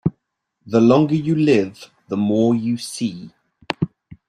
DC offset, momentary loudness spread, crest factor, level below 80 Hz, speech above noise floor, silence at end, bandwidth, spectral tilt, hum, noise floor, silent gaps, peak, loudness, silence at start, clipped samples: under 0.1%; 13 LU; 18 dB; -56 dBFS; 55 dB; 0.15 s; 13 kHz; -7 dB/octave; none; -73 dBFS; none; -2 dBFS; -19 LUFS; 0.05 s; under 0.1%